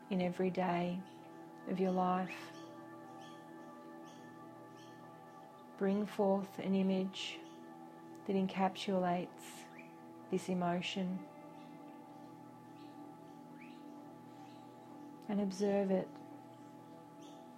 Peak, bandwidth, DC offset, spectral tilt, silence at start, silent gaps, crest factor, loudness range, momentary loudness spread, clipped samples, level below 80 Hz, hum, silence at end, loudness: -20 dBFS; 14 kHz; under 0.1%; -6.5 dB/octave; 0 s; none; 20 dB; 15 LU; 20 LU; under 0.1%; -80 dBFS; none; 0 s; -37 LUFS